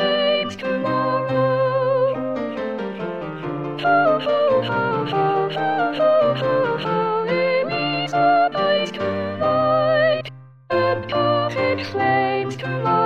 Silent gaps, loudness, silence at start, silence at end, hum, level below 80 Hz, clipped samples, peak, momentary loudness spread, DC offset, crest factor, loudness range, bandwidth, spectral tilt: none; -20 LUFS; 0 s; 0 s; none; -58 dBFS; under 0.1%; -6 dBFS; 8 LU; 0.2%; 14 dB; 2 LU; 8.2 kHz; -6.5 dB/octave